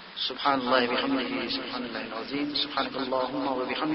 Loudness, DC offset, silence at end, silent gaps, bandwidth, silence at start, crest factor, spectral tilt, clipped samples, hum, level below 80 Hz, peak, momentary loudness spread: -28 LUFS; under 0.1%; 0 s; none; 6 kHz; 0 s; 20 dB; -6.5 dB/octave; under 0.1%; none; -62 dBFS; -8 dBFS; 9 LU